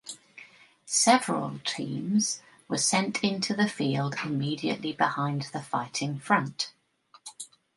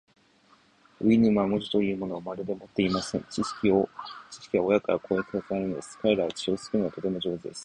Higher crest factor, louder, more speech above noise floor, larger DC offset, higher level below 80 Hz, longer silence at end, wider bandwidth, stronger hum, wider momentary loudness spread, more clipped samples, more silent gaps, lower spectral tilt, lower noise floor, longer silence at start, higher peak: about the same, 22 dB vs 18 dB; about the same, -28 LUFS vs -27 LUFS; about the same, 33 dB vs 34 dB; neither; second, -74 dBFS vs -58 dBFS; first, 0.3 s vs 0 s; about the same, 11.5 kHz vs 10.5 kHz; neither; first, 15 LU vs 10 LU; neither; neither; second, -3.5 dB/octave vs -6 dB/octave; about the same, -60 dBFS vs -61 dBFS; second, 0.05 s vs 1 s; first, -6 dBFS vs -10 dBFS